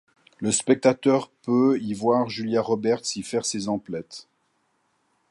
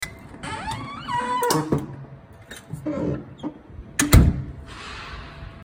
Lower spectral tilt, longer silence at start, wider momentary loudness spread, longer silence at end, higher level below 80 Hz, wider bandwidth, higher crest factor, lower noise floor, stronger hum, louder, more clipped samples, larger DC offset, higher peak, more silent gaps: about the same, -4.5 dB/octave vs -5 dB/octave; first, 0.4 s vs 0 s; second, 11 LU vs 23 LU; first, 1.1 s vs 0 s; second, -66 dBFS vs -30 dBFS; second, 11.5 kHz vs 16.5 kHz; about the same, 20 dB vs 24 dB; first, -70 dBFS vs -43 dBFS; neither; about the same, -24 LUFS vs -24 LUFS; neither; neither; second, -4 dBFS vs 0 dBFS; neither